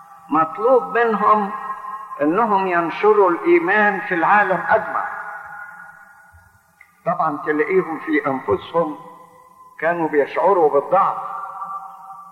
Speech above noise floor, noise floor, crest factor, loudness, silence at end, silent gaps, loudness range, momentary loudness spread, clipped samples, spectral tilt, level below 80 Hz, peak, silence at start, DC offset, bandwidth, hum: 35 dB; -52 dBFS; 16 dB; -18 LUFS; 0 s; none; 7 LU; 15 LU; under 0.1%; -7.5 dB/octave; -64 dBFS; -4 dBFS; 0 s; under 0.1%; 12 kHz; none